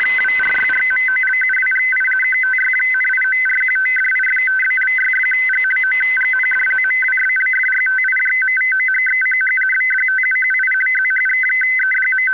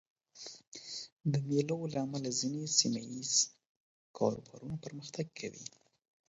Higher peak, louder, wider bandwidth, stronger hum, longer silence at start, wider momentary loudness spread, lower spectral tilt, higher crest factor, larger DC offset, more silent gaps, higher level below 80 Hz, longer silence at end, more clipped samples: about the same, -12 dBFS vs -12 dBFS; first, -13 LUFS vs -35 LUFS; second, 4 kHz vs 8 kHz; neither; second, 0 s vs 0.35 s; second, 0 LU vs 19 LU; second, -2 dB/octave vs -5.5 dB/octave; second, 4 dB vs 24 dB; first, 0.4% vs under 0.1%; second, none vs 0.67-0.72 s, 1.12-1.17 s, 3.66-4.14 s; first, -64 dBFS vs -74 dBFS; second, 0 s vs 0.6 s; neither